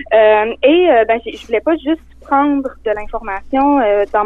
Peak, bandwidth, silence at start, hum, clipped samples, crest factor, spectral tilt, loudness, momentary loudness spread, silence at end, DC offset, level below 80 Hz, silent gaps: -2 dBFS; 7 kHz; 0 s; none; under 0.1%; 12 dB; -6 dB/octave; -14 LUFS; 11 LU; 0 s; under 0.1%; -38 dBFS; none